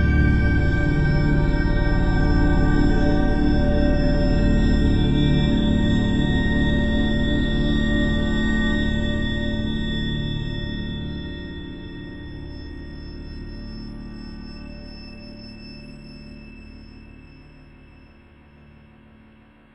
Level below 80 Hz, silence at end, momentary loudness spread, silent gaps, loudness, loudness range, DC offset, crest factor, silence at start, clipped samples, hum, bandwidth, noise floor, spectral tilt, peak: -24 dBFS; 2.35 s; 19 LU; none; -21 LUFS; 19 LU; under 0.1%; 16 dB; 0 s; under 0.1%; none; 8 kHz; -51 dBFS; -7.5 dB/octave; -6 dBFS